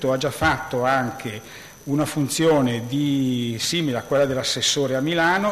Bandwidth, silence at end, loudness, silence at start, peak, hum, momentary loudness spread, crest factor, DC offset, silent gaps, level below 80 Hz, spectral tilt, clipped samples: 14 kHz; 0 s; -21 LUFS; 0 s; -8 dBFS; none; 9 LU; 14 dB; under 0.1%; none; -50 dBFS; -4 dB/octave; under 0.1%